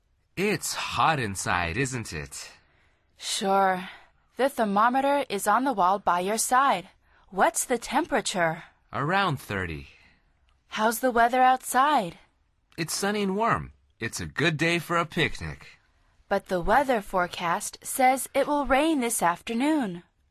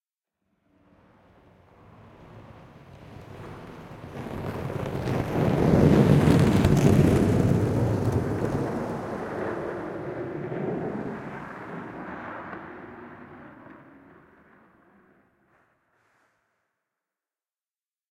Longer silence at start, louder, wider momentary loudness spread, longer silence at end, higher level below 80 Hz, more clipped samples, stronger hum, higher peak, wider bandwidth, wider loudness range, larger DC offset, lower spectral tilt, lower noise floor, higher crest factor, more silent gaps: second, 0.35 s vs 2.2 s; about the same, -25 LUFS vs -25 LUFS; second, 14 LU vs 24 LU; second, 0.3 s vs 4.35 s; second, -50 dBFS vs -44 dBFS; neither; neither; about the same, -8 dBFS vs -6 dBFS; second, 13.5 kHz vs 16 kHz; second, 4 LU vs 22 LU; neither; second, -4 dB/octave vs -8 dB/octave; second, -65 dBFS vs under -90 dBFS; about the same, 18 dB vs 22 dB; neither